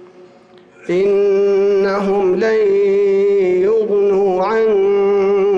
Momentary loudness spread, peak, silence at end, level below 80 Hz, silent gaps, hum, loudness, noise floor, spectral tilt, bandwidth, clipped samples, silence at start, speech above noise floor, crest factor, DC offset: 2 LU; -8 dBFS; 0 s; -54 dBFS; none; none; -14 LUFS; -45 dBFS; -7 dB/octave; 7 kHz; under 0.1%; 0.85 s; 31 dB; 6 dB; under 0.1%